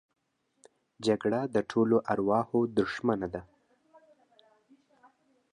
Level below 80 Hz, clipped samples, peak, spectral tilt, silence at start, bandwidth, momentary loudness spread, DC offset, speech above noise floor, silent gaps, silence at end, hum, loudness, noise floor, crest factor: -64 dBFS; under 0.1%; -12 dBFS; -7 dB/octave; 1 s; 10.5 kHz; 7 LU; under 0.1%; 36 dB; none; 2.1 s; none; -29 LUFS; -65 dBFS; 18 dB